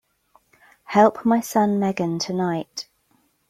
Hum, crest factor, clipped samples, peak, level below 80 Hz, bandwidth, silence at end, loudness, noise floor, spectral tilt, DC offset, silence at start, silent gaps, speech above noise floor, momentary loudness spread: none; 20 dB; under 0.1%; -2 dBFS; -64 dBFS; 16 kHz; 0.7 s; -21 LUFS; -65 dBFS; -5.5 dB/octave; under 0.1%; 0.9 s; none; 44 dB; 16 LU